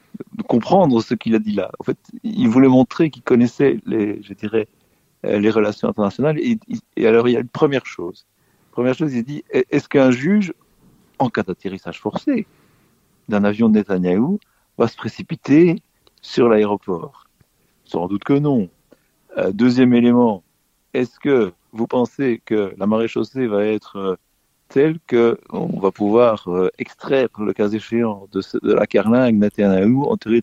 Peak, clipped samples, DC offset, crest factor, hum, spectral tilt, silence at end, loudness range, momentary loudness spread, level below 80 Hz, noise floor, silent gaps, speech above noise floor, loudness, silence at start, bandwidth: 0 dBFS; under 0.1%; under 0.1%; 18 dB; none; -8 dB/octave; 0 s; 3 LU; 13 LU; -58 dBFS; -60 dBFS; none; 42 dB; -18 LUFS; 0.15 s; 7.8 kHz